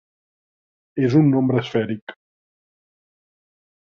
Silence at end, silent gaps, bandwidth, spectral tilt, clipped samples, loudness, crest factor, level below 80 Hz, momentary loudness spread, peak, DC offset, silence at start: 1.75 s; 2.02-2.07 s; 7 kHz; -8.5 dB/octave; under 0.1%; -19 LUFS; 18 dB; -62 dBFS; 16 LU; -4 dBFS; under 0.1%; 0.95 s